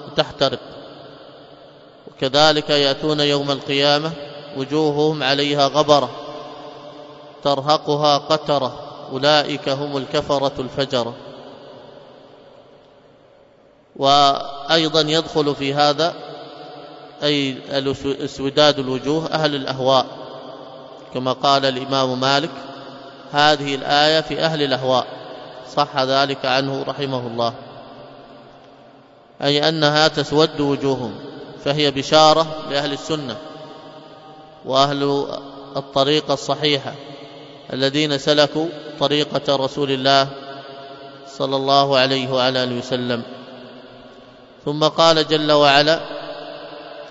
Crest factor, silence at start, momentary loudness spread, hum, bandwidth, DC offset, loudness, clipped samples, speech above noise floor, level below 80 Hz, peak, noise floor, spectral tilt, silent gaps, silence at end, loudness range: 20 dB; 0 s; 22 LU; none; 8 kHz; under 0.1%; -18 LUFS; under 0.1%; 33 dB; -56 dBFS; 0 dBFS; -51 dBFS; -4.5 dB/octave; none; 0 s; 4 LU